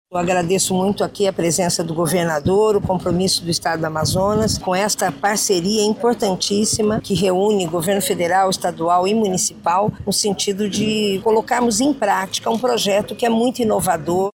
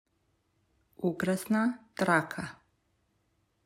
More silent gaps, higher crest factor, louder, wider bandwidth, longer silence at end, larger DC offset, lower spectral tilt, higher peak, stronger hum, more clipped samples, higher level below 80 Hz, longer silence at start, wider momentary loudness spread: neither; second, 14 dB vs 22 dB; first, -18 LUFS vs -30 LUFS; about the same, 17 kHz vs 16 kHz; second, 0.05 s vs 1.15 s; neither; second, -4 dB/octave vs -6 dB/octave; first, -4 dBFS vs -10 dBFS; neither; neither; first, -46 dBFS vs -70 dBFS; second, 0.1 s vs 1 s; second, 3 LU vs 12 LU